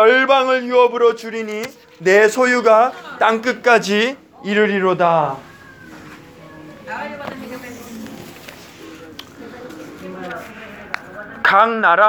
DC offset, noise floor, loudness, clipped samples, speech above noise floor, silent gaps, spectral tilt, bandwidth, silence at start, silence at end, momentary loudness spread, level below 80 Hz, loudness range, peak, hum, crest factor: under 0.1%; -40 dBFS; -15 LUFS; under 0.1%; 25 dB; none; -4 dB/octave; over 20 kHz; 0 s; 0 s; 23 LU; -60 dBFS; 18 LU; 0 dBFS; none; 18 dB